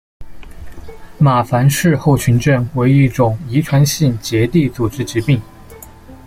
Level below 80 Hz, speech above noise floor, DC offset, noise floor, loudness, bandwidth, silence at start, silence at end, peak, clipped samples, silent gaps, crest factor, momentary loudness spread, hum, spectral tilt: -38 dBFS; 24 dB; under 0.1%; -37 dBFS; -14 LUFS; 16 kHz; 0.2 s; 0.1 s; -2 dBFS; under 0.1%; none; 14 dB; 6 LU; none; -6.5 dB/octave